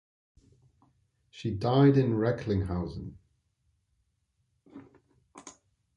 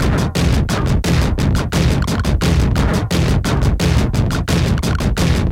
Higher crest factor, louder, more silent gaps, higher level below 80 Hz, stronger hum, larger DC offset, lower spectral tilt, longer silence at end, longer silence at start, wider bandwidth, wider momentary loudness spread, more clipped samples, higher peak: first, 20 dB vs 12 dB; second, -27 LUFS vs -16 LUFS; neither; second, -52 dBFS vs -20 dBFS; neither; neither; first, -8 dB/octave vs -6 dB/octave; first, 0.45 s vs 0 s; first, 1.35 s vs 0 s; second, 9.6 kHz vs 16.5 kHz; first, 27 LU vs 2 LU; neither; second, -12 dBFS vs -2 dBFS